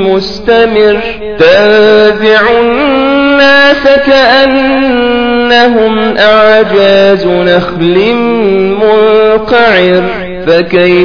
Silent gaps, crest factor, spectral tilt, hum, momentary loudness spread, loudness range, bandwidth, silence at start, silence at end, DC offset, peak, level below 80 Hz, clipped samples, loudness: none; 6 dB; -6 dB/octave; none; 5 LU; 2 LU; 5.4 kHz; 0 s; 0 s; under 0.1%; 0 dBFS; -34 dBFS; 4%; -6 LUFS